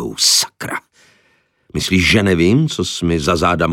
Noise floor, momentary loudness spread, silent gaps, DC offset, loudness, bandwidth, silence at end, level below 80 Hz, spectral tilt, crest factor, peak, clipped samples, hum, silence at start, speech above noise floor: -59 dBFS; 14 LU; none; under 0.1%; -15 LUFS; 17 kHz; 0 s; -38 dBFS; -3.5 dB/octave; 14 dB; -2 dBFS; under 0.1%; none; 0 s; 44 dB